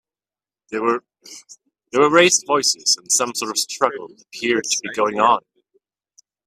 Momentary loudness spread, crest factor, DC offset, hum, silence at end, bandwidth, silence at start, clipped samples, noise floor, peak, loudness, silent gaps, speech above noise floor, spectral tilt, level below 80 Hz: 14 LU; 20 dB; under 0.1%; none; 1.05 s; 16 kHz; 0.7 s; under 0.1%; under -90 dBFS; 0 dBFS; -18 LUFS; none; over 71 dB; -1.5 dB/octave; -68 dBFS